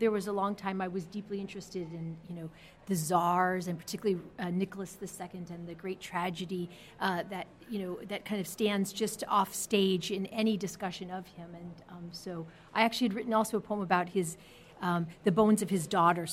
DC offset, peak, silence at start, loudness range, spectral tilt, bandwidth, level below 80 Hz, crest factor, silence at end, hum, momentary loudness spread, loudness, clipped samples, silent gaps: under 0.1%; -12 dBFS; 0 s; 6 LU; -5 dB/octave; 16.5 kHz; -66 dBFS; 22 dB; 0 s; none; 15 LU; -33 LUFS; under 0.1%; none